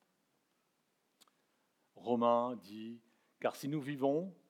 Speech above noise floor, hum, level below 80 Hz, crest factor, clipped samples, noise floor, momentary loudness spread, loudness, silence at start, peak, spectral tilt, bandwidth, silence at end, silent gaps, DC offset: 44 dB; none; under -90 dBFS; 22 dB; under 0.1%; -80 dBFS; 17 LU; -36 LUFS; 1.95 s; -18 dBFS; -6.5 dB/octave; 16.5 kHz; 0.15 s; none; under 0.1%